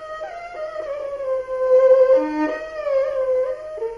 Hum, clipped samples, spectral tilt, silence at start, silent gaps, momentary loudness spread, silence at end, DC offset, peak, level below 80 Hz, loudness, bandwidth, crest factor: 50 Hz at -60 dBFS; under 0.1%; -5.5 dB/octave; 0 s; none; 17 LU; 0 s; under 0.1%; -4 dBFS; -56 dBFS; -20 LUFS; 6.6 kHz; 16 dB